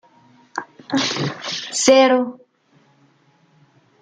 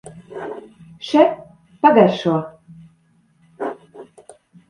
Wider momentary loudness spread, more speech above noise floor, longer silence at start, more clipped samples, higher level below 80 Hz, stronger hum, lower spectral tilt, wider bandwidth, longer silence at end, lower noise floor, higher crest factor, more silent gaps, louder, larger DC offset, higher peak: second, 19 LU vs 23 LU; second, 40 dB vs 44 dB; first, 0.55 s vs 0.05 s; neither; about the same, -68 dBFS vs -64 dBFS; neither; second, -3 dB/octave vs -7 dB/octave; about the same, 9.6 kHz vs 10.5 kHz; first, 1.65 s vs 0.65 s; about the same, -58 dBFS vs -58 dBFS; about the same, 20 dB vs 20 dB; neither; about the same, -18 LUFS vs -17 LUFS; neither; about the same, -2 dBFS vs 0 dBFS